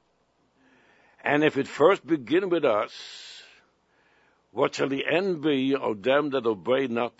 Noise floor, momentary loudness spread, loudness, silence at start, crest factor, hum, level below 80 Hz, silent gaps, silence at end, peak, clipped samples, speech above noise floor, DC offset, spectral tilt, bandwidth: -69 dBFS; 17 LU; -25 LUFS; 1.25 s; 22 dB; none; -74 dBFS; none; 0.1 s; -4 dBFS; under 0.1%; 44 dB; under 0.1%; -5.5 dB/octave; 8 kHz